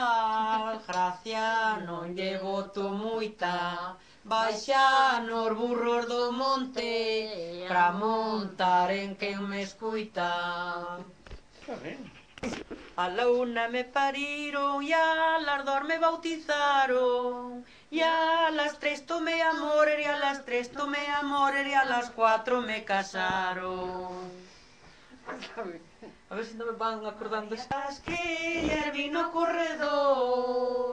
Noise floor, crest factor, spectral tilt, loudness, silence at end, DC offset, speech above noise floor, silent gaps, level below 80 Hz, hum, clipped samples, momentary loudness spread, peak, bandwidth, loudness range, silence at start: -55 dBFS; 18 dB; -4 dB/octave; -29 LUFS; 0 s; under 0.1%; 27 dB; none; -60 dBFS; none; under 0.1%; 14 LU; -12 dBFS; 10 kHz; 8 LU; 0 s